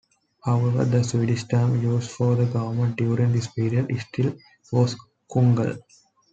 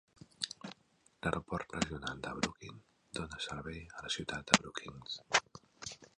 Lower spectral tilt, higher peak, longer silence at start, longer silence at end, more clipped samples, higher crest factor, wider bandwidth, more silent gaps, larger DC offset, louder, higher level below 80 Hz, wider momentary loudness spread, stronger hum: first, -7.5 dB/octave vs -3 dB/octave; second, -6 dBFS vs -2 dBFS; first, 0.45 s vs 0.2 s; first, 0.5 s vs 0.15 s; neither; second, 16 dB vs 38 dB; second, 8 kHz vs 11.5 kHz; neither; neither; first, -23 LUFS vs -37 LUFS; about the same, -60 dBFS vs -60 dBFS; second, 7 LU vs 17 LU; neither